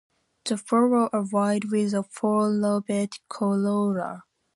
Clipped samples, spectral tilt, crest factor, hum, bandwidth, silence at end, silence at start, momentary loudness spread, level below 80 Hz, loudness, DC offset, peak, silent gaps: under 0.1%; -6.5 dB/octave; 16 dB; none; 11.5 kHz; 0.35 s; 0.45 s; 9 LU; -72 dBFS; -25 LUFS; under 0.1%; -10 dBFS; none